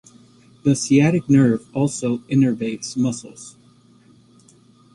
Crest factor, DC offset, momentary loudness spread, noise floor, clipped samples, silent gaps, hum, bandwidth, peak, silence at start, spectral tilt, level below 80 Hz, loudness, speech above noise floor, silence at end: 18 dB; under 0.1%; 16 LU; -52 dBFS; under 0.1%; none; none; 11.5 kHz; -4 dBFS; 0.65 s; -6 dB/octave; -56 dBFS; -19 LUFS; 34 dB; 1.45 s